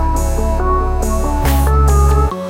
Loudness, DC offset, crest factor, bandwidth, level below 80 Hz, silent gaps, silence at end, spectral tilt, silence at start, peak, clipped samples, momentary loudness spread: -15 LUFS; under 0.1%; 10 dB; 16.5 kHz; -14 dBFS; none; 0 s; -6.5 dB/octave; 0 s; -2 dBFS; under 0.1%; 6 LU